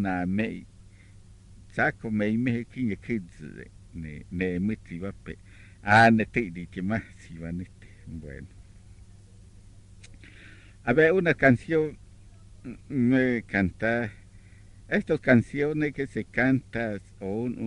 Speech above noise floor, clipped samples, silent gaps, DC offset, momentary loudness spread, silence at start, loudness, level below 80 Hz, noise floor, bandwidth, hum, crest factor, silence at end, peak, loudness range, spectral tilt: 25 dB; under 0.1%; none; under 0.1%; 22 LU; 0 s; -26 LUFS; -50 dBFS; -51 dBFS; 11 kHz; none; 24 dB; 0 s; -4 dBFS; 12 LU; -7.5 dB/octave